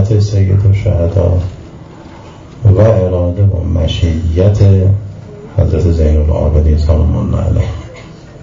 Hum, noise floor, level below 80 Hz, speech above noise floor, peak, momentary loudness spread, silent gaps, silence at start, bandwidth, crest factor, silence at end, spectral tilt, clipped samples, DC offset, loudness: none; -32 dBFS; -18 dBFS; 23 dB; 0 dBFS; 14 LU; none; 0 s; 7.4 kHz; 10 dB; 0.05 s; -8.5 dB/octave; 0.2%; under 0.1%; -12 LUFS